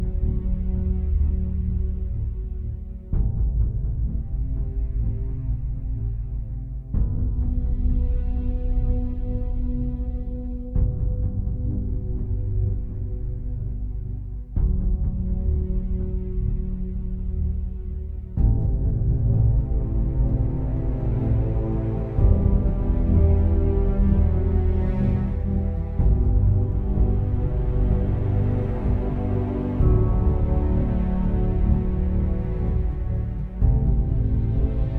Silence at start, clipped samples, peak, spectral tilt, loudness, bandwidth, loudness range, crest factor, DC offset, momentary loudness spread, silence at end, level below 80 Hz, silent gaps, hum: 0 s; under 0.1%; -4 dBFS; -12.5 dB/octave; -25 LUFS; 2.9 kHz; 6 LU; 16 dB; under 0.1%; 10 LU; 0 s; -24 dBFS; none; none